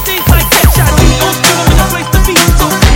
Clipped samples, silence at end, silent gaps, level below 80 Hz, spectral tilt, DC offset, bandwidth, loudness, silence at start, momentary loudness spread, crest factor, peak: 3%; 0 s; none; -12 dBFS; -4 dB/octave; under 0.1%; 19.5 kHz; -8 LUFS; 0 s; 3 LU; 8 dB; 0 dBFS